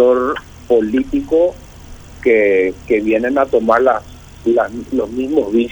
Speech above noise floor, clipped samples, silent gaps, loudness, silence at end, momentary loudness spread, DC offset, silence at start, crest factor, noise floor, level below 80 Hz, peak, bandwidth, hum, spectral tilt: 21 dB; under 0.1%; none; -15 LUFS; 0 s; 8 LU; under 0.1%; 0 s; 14 dB; -35 dBFS; -40 dBFS; 0 dBFS; over 20 kHz; none; -6.5 dB/octave